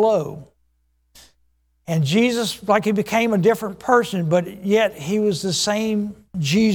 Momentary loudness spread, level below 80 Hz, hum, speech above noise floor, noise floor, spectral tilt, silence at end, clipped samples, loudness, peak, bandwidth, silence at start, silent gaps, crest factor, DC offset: 8 LU; -56 dBFS; none; 46 dB; -65 dBFS; -5 dB/octave; 0 s; under 0.1%; -20 LUFS; -2 dBFS; 19 kHz; 0 s; none; 18 dB; under 0.1%